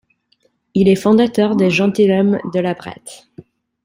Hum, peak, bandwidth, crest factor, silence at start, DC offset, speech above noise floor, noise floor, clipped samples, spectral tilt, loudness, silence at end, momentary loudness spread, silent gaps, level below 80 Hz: none; -2 dBFS; 15.5 kHz; 14 dB; 0.75 s; under 0.1%; 47 dB; -61 dBFS; under 0.1%; -6.5 dB/octave; -15 LUFS; 0.7 s; 16 LU; none; -52 dBFS